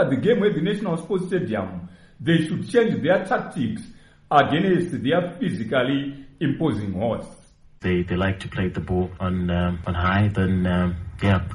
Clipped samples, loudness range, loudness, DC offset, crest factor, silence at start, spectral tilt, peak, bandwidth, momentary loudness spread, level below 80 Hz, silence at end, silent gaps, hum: under 0.1%; 3 LU; -23 LUFS; under 0.1%; 20 dB; 0 s; -7.5 dB/octave; -2 dBFS; 11 kHz; 8 LU; -44 dBFS; 0 s; none; none